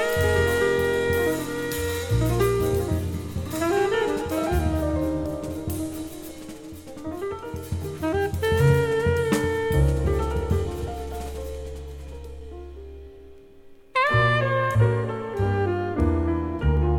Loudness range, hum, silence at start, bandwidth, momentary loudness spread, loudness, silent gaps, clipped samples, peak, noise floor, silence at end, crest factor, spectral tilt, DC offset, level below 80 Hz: 8 LU; none; 0 s; 19 kHz; 17 LU; -24 LUFS; none; under 0.1%; -8 dBFS; -47 dBFS; 0 s; 16 dB; -6 dB/octave; under 0.1%; -34 dBFS